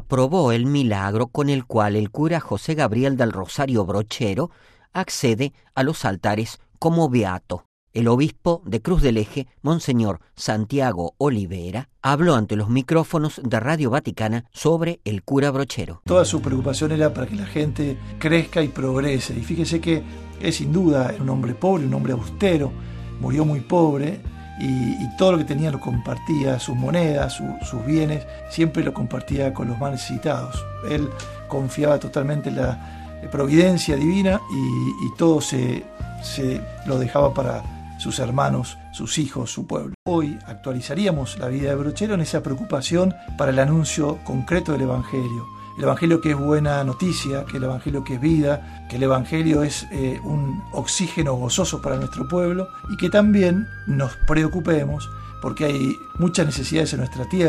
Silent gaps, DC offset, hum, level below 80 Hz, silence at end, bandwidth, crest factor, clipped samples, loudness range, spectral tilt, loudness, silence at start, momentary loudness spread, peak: 7.65-7.87 s, 39.94-40.06 s; under 0.1%; none; -38 dBFS; 0 s; 14 kHz; 20 dB; under 0.1%; 3 LU; -6 dB/octave; -22 LUFS; 0 s; 10 LU; -2 dBFS